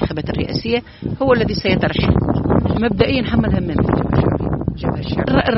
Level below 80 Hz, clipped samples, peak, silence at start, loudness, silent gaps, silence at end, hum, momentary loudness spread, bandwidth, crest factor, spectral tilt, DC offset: -30 dBFS; under 0.1%; 0 dBFS; 0 s; -18 LUFS; none; 0 s; none; 6 LU; 6 kHz; 16 dB; -6 dB/octave; under 0.1%